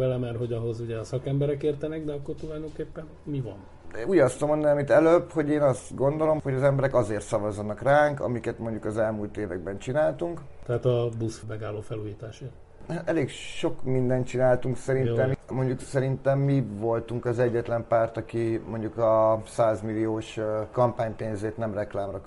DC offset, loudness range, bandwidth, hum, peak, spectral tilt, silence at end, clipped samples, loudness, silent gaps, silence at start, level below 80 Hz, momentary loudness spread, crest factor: under 0.1%; 7 LU; 11.5 kHz; none; -8 dBFS; -7.5 dB/octave; 0 s; under 0.1%; -27 LUFS; none; 0 s; -50 dBFS; 13 LU; 18 dB